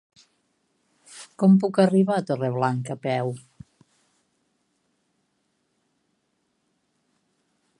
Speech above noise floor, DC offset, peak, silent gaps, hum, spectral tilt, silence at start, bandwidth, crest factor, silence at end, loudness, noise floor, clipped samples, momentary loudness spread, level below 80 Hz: 52 dB; under 0.1%; -6 dBFS; none; none; -7.5 dB/octave; 1.1 s; 11 kHz; 22 dB; 4.4 s; -22 LUFS; -73 dBFS; under 0.1%; 18 LU; -72 dBFS